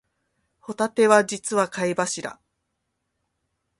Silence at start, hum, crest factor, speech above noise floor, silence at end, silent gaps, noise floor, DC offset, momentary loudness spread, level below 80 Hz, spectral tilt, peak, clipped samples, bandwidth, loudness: 0.7 s; none; 24 dB; 55 dB; 1.45 s; none; -77 dBFS; under 0.1%; 15 LU; -70 dBFS; -3.5 dB/octave; -2 dBFS; under 0.1%; 11.5 kHz; -22 LUFS